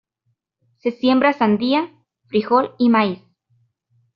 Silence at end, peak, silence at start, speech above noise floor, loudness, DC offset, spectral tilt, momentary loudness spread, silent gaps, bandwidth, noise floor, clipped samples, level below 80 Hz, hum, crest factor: 1 s; -4 dBFS; 0.85 s; 54 dB; -18 LUFS; under 0.1%; -4 dB/octave; 11 LU; none; 5.6 kHz; -71 dBFS; under 0.1%; -64 dBFS; none; 16 dB